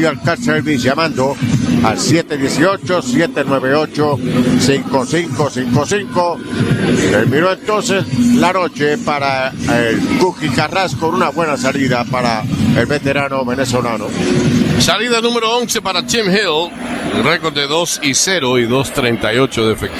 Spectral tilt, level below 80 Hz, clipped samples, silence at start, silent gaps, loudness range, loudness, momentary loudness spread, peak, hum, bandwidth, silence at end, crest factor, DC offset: -4.5 dB/octave; -42 dBFS; under 0.1%; 0 s; none; 1 LU; -14 LUFS; 4 LU; 0 dBFS; none; 14.5 kHz; 0 s; 14 dB; under 0.1%